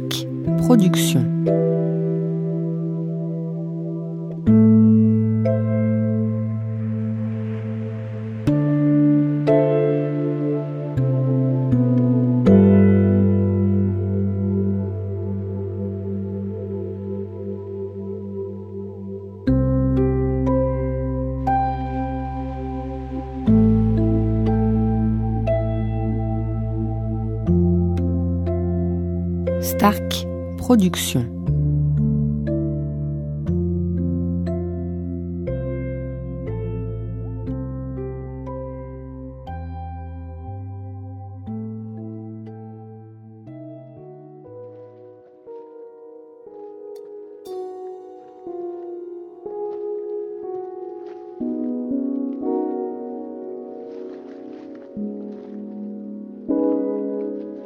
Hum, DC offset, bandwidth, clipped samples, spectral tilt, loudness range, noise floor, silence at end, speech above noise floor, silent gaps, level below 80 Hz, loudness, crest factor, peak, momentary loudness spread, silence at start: none; under 0.1%; 16 kHz; under 0.1%; -7.5 dB/octave; 17 LU; -45 dBFS; 0 s; 28 dB; none; -36 dBFS; -21 LUFS; 20 dB; -2 dBFS; 19 LU; 0 s